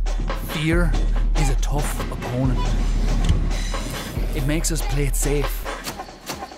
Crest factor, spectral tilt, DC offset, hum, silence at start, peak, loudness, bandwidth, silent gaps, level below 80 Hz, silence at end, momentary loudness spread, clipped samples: 16 dB; -5 dB/octave; under 0.1%; none; 0 s; -4 dBFS; -24 LUFS; 16 kHz; none; -22 dBFS; 0 s; 7 LU; under 0.1%